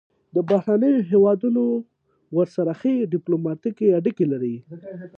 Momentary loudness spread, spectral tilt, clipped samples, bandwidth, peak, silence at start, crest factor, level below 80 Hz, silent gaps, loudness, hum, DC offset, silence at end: 10 LU; -10.5 dB/octave; under 0.1%; 6.4 kHz; -6 dBFS; 0.35 s; 14 dB; -70 dBFS; none; -21 LUFS; none; under 0.1%; 0.1 s